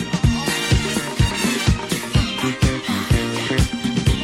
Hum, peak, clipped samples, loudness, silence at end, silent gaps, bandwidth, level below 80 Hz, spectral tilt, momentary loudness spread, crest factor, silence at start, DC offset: none; -4 dBFS; under 0.1%; -20 LUFS; 0 s; none; 16.5 kHz; -26 dBFS; -4.5 dB/octave; 2 LU; 16 dB; 0 s; under 0.1%